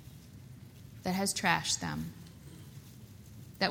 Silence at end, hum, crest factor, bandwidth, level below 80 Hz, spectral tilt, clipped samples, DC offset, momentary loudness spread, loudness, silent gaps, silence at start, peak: 0 s; none; 26 dB; over 20 kHz; -60 dBFS; -3 dB/octave; under 0.1%; under 0.1%; 23 LU; -32 LUFS; none; 0 s; -10 dBFS